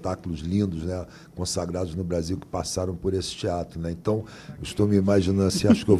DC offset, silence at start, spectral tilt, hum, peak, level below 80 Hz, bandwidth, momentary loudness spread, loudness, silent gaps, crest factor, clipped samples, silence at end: under 0.1%; 0 s; -6 dB/octave; none; -6 dBFS; -40 dBFS; 13.5 kHz; 12 LU; -26 LUFS; none; 20 dB; under 0.1%; 0 s